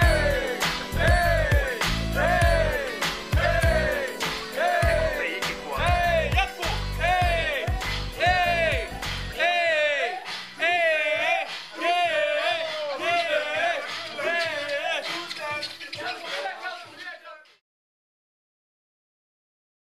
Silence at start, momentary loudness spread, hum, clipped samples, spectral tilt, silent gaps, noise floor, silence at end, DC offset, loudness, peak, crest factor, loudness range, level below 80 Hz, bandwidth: 0 s; 10 LU; none; under 0.1%; -4 dB/octave; none; -45 dBFS; 2.45 s; 0.2%; -24 LUFS; -8 dBFS; 18 dB; 10 LU; -34 dBFS; 15.5 kHz